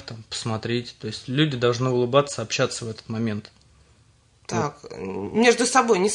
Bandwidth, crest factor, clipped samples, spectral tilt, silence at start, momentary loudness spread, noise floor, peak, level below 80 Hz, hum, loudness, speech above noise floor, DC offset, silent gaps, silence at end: 11 kHz; 20 dB; under 0.1%; -4.5 dB/octave; 0 s; 14 LU; -58 dBFS; -4 dBFS; -60 dBFS; none; -23 LUFS; 35 dB; under 0.1%; none; 0 s